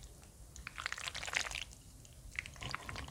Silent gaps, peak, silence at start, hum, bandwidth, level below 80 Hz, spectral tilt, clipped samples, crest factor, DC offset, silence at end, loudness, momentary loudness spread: none; -16 dBFS; 0 s; none; 18 kHz; -56 dBFS; -1.5 dB/octave; under 0.1%; 30 dB; under 0.1%; 0 s; -42 LUFS; 18 LU